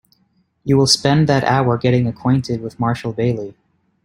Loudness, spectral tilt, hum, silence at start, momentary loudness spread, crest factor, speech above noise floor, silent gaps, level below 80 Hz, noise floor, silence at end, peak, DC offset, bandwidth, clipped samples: -17 LUFS; -5.5 dB/octave; none; 0.65 s; 11 LU; 16 dB; 46 dB; none; -50 dBFS; -62 dBFS; 0.55 s; -2 dBFS; under 0.1%; 15.5 kHz; under 0.1%